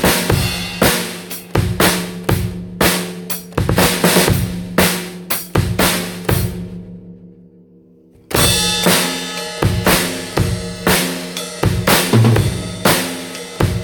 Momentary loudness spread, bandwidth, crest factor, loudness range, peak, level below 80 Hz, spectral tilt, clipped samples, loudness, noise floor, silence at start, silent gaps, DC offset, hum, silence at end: 11 LU; over 20 kHz; 16 dB; 3 LU; 0 dBFS; -32 dBFS; -4 dB/octave; under 0.1%; -16 LUFS; -47 dBFS; 0 s; none; under 0.1%; none; 0 s